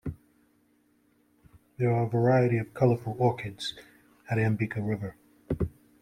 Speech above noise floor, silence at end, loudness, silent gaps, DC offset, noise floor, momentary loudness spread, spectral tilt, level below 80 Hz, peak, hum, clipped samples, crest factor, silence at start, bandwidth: 40 dB; 0.35 s; -28 LUFS; none; under 0.1%; -67 dBFS; 12 LU; -7.5 dB/octave; -52 dBFS; -10 dBFS; none; under 0.1%; 20 dB; 0.05 s; 10.5 kHz